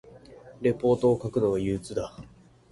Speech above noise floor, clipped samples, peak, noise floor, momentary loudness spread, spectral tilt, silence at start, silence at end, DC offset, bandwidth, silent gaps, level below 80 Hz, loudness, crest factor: 23 dB; under 0.1%; -12 dBFS; -49 dBFS; 11 LU; -7.5 dB/octave; 0.3 s; 0.5 s; under 0.1%; 11.5 kHz; none; -52 dBFS; -26 LUFS; 16 dB